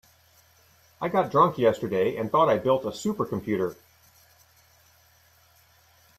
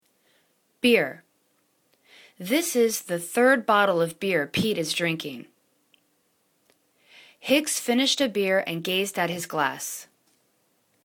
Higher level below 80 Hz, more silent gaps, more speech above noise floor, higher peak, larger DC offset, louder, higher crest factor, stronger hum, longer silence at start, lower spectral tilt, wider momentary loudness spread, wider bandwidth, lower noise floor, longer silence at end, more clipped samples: about the same, -64 dBFS vs -66 dBFS; neither; second, 36 dB vs 45 dB; about the same, -6 dBFS vs -6 dBFS; neither; about the same, -25 LUFS vs -24 LUFS; about the same, 20 dB vs 20 dB; neither; first, 1 s vs 0.85 s; first, -6.5 dB/octave vs -3 dB/octave; second, 9 LU vs 12 LU; second, 14 kHz vs 19 kHz; second, -60 dBFS vs -69 dBFS; first, 2.45 s vs 1 s; neither